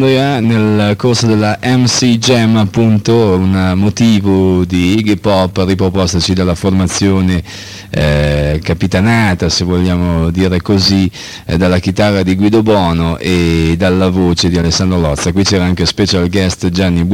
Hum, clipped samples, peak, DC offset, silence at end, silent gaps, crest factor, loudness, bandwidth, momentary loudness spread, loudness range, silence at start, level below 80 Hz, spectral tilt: none; under 0.1%; -2 dBFS; under 0.1%; 0 s; none; 10 dB; -11 LUFS; 15.5 kHz; 4 LU; 2 LU; 0 s; -28 dBFS; -5.5 dB/octave